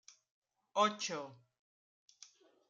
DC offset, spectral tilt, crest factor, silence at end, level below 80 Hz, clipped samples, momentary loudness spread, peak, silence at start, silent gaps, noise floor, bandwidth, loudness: under 0.1%; -2.5 dB/octave; 24 dB; 1.35 s; under -90 dBFS; under 0.1%; 25 LU; -18 dBFS; 0.75 s; none; -63 dBFS; 9.4 kHz; -36 LUFS